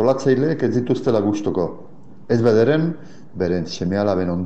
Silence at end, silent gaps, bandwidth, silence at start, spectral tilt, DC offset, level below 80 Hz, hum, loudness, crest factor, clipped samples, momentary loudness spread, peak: 0 s; none; 8.4 kHz; 0 s; -7.5 dB/octave; 1%; -52 dBFS; none; -20 LUFS; 16 dB; under 0.1%; 10 LU; -4 dBFS